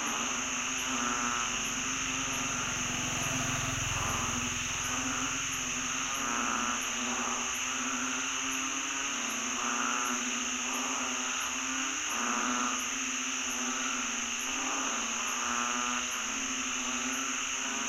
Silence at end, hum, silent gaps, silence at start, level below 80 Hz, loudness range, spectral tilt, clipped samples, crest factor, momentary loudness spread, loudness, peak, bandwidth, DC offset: 0 s; none; none; 0 s; -56 dBFS; 0 LU; -1 dB/octave; under 0.1%; 16 dB; 2 LU; -31 LUFS; -18 dBFS; 16 kHz; under 0.1%